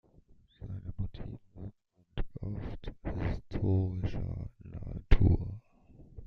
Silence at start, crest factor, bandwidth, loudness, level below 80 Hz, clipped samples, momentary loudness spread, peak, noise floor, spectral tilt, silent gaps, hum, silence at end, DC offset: 0.6 s; 26 dB; 5.6 kHz; -35 LUFS; -38 dBFS; under 0.1%; 19 LU; -8 dBFS; -61 dBFS; -9.5 dB/octave; none; none; 0 s; under 0.1%